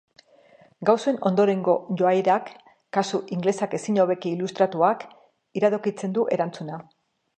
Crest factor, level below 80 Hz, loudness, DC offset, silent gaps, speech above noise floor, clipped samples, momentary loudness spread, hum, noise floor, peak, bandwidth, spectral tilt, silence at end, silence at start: 20 dB; -76 dBFS; -24 LUFS; under 0.1%; none; 32 dB; under 0.1%; 11 LU; none; -55 dBFS; -4 dBFS; 9.4 kHz; -6.5 dB/octave; 0.55 s; 0.8 s